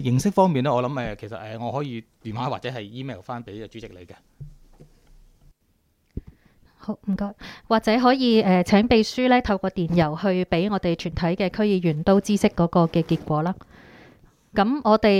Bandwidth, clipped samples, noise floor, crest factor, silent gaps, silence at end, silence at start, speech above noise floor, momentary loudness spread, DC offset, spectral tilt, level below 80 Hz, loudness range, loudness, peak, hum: 14 kHz; under 0.1%; -66 dBFS; 20 dB; none; 0 s; 0 s; 45 dB; 18 LU; under 0.1%; -6.5 dB/octave; -46 dBFS; 17 LU; -22 LUFS; -4 dBFS; none